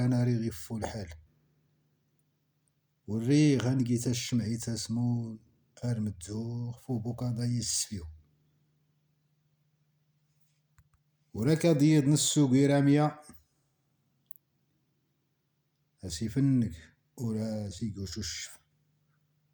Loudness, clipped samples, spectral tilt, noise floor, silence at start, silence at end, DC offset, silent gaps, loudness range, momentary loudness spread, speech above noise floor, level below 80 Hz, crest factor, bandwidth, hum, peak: -30 LUFS; under 0.1%; -5.5 dB/octave; -77 dBFS; 0 s; 1 s; under 0.1%; none; 10 LU; 19 LU; 48 dB; -60 dBFS; 18 dB; over 20 kHz; none; -14 dBFS